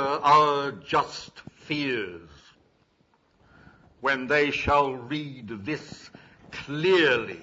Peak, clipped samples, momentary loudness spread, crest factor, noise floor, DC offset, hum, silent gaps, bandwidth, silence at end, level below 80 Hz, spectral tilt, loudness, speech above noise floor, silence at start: -6 dBFS; under 0.1%; 20 LU; 20 dB; -66 dBFS; under 0.1%; none; none; 8 kHz; 0 s; -54 dBFS; -5 dB/octave; -25 LUFS; 41 dB; 0 s